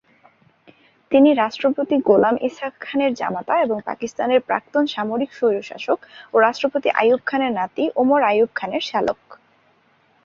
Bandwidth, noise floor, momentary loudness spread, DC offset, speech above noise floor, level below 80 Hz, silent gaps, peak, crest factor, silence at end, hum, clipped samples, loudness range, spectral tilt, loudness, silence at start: 7.4 kHz; -59 dBFS; 9 LU; under 0.1%; 40 dB; -64 dBFS; none; -2 dBFS; 18 dB; 0.9 s; none; under 0.1%; 3 LU; -5.5 dB/octave; -20 LUFS; 1.1 s